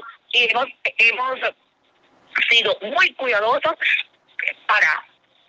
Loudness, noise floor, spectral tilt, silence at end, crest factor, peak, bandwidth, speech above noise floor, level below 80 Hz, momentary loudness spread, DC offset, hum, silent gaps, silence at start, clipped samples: -18 LUFS; -60 dBFS; -1 dB/octave; 0.5 s; 18 dB; -4 dBFS; 9.6 kHz; 41 dB; -74 dBFS; 10 LU; under 0.1%; none; none; 0 s; under 0.1%